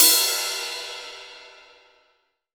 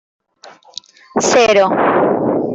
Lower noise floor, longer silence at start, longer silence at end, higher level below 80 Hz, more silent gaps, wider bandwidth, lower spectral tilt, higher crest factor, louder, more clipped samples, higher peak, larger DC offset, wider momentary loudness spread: first, -68 dBFS vs -43 dBFS; second, 0 s vs 0.45 s; first, 1.05 s vs 0 s; second, -70 dBFS vs -54 dBFS; neither; first, over 20 kHz vs 8.4 kHz; second, 3 dB/octave vs -3.5 dB/octave; first, 24 dB vs 14 dB; second, -21 LUFS vs -13 LUFS; neither; about the same, -2 dBFS vs -2 dBFS; neither; about the same, 24 LU vs 22 LU